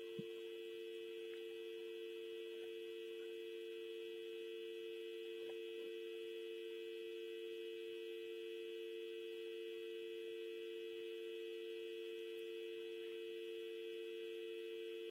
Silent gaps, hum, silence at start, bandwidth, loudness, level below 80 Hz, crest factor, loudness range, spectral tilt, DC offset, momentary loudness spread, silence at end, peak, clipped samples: none; none; 0 s; 16 kHz; -49 LUFS; under -90 dBFS; 14 dB; 1 LU; -4 dB/octave; under 0.1%; 1 LU; 0 s; -36 dBFS; under 0.1%